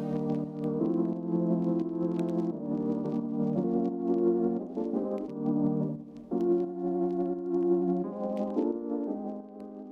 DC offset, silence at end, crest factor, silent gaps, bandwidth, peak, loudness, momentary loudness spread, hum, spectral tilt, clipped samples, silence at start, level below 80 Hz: under 0.1%; 0 s; 14 dB; none; 4.8 kHz; -16 dBFS; -30 LUFS; 6 LU; none; -11 dB/octave; under 0.1%; 0 s; -66 dBFS